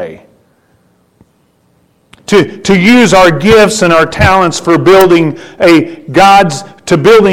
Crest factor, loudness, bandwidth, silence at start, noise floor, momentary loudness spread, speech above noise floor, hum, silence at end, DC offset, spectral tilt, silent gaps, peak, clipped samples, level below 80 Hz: 8 dB; -7 LUFS; 18 kHz; 0 s; -52 dBFS; 8 LU; 46 dB; none; 0 s; under 0.1%; -5 dB/octave; none; 0 dBFS; 0.4%; -32 dBFS